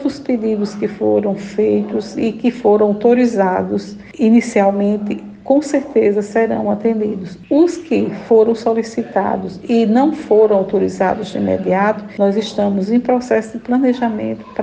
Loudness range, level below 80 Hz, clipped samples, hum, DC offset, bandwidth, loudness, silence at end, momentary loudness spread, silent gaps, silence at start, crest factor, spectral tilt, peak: 2 LU; -54 dBFS; under 0.1%; none; under 0.1%; 9.2 kHz; -16 LUFS; 0 s; 8 LU; none; 0 s; 14 dB; -7 dB/octave; -2 dBFS